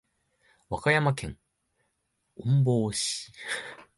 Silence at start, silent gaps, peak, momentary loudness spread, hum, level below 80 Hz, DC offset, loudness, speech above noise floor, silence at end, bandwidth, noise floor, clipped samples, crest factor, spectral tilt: 0.7 s; none; -10 dBFS; 12 LU; none; -56 dBFS; under 0.1%; -28 LUFS; 50 dB; 0.15 s; 11.5 kHz; -77 dBFS; under 0.1%; 20 dB; -5 dB/octave